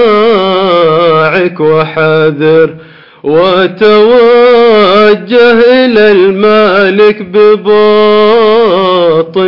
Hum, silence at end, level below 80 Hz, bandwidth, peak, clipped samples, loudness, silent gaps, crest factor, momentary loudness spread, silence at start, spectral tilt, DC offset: none; 0 s; -46 dBFS; 6 kHz; 0 dBFS; 2%; -6 LUFS; none; 6 dB; 5 LU; 0 s; -7.5 dB/octave; 2%